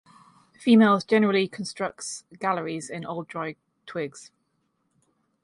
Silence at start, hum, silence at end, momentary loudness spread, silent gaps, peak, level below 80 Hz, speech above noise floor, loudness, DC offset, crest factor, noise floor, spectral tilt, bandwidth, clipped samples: 0.6 s; none; 1.2 s; 17 LU; none; -8 dBFS; -72 dBFS; 49 dB; -25 LUFS; under 0.1%; 20 dB; -73 dBFS; -5 dB/octave; 11.5 kHz; under 0.1%